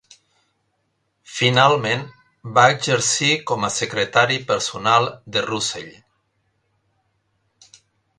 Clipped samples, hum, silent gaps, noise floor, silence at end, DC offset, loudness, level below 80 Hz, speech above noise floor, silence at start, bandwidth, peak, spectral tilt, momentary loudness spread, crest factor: under 0.1%; none; none; -70 dBFS; 2.3 s; under 0.1%; -18 LUFS; -60 dBFS; 51 dB; 1.3 s; 11.5 kHz; 0 dBFS; -3 dB/octave; 12 LU; 22 dB